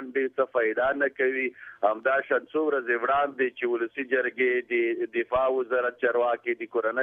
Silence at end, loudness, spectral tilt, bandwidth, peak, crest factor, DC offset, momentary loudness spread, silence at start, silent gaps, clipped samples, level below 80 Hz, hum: 0 s; -26 LUFS; -7 dB/octave; 3.8 kHz; -10 dBFS; 16 dB; under 0.1%; 4 LU; 0 s; none; under 0.1%; -66 dBFS; none